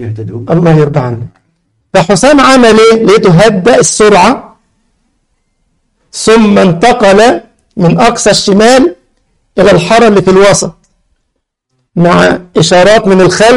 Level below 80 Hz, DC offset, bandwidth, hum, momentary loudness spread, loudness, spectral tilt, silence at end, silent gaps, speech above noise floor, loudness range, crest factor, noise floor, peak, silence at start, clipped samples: -34 dBFS; under 0.1%; 11.5 kHz; none; 13 LU; -5 LUFS; -5 dB/octave; 0 s; none; 60 dB; 4 LU; 6 dB; -65 dBFS; 0 dBFS; 0 s; 0.9%